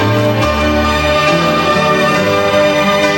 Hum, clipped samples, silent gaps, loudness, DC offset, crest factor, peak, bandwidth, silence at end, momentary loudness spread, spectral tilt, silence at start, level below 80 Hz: none; under 0.1%; none; -11 LUFS; under 0.1%; 12 dB; 0 dBFS; 16.5 kHz; 0 s; 2 LU; -5 dB/octave; 0 s; -28 dBFS